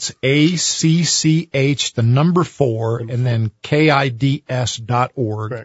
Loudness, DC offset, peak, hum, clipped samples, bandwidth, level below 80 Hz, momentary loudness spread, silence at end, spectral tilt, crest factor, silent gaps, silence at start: -17 LUFS; under 0.1%; 0 dBFS; none; under 0.1%; 8 kHz; -54 dBFS; 7 LU; 0 s; -5 dB/octave; 16 dB; none; 0 s